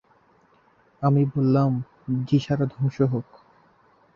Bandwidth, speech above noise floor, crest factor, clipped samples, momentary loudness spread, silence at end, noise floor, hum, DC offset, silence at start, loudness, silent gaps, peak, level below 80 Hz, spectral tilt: 6.8 kHz; 38 dB; 18 dB; under 0.1%; 8 LU; 0.95 s; -60 dBFS; none; under 0.1%; 1 s; -24 LUFS; none; -8 dBFS; -58 dBFS; -9.5 dB/octave